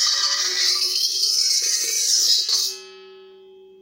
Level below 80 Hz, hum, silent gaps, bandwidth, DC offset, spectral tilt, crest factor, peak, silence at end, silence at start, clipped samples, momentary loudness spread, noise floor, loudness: -84 dBFS; none; none; 16 kHz; under 0.1%; 4.5 dB/octave; 16 dB; -6 dBFS; 0.5 s; 0 s; under 0.1%; 4 LU; -46 dBFS; -17 LUFS